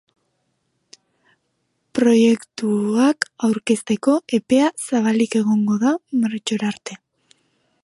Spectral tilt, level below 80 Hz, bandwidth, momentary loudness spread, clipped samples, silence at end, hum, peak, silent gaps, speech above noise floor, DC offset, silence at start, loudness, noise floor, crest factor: -5 dB/octave; -66 dBFS; 11.5 kHz; 7 LU; under 0.1%; 0.9 s; none; -2 dBFS; none; 53 dB; under 0.1%; 1.95 s; -19 LUFS; -71 dBFS; 18 dB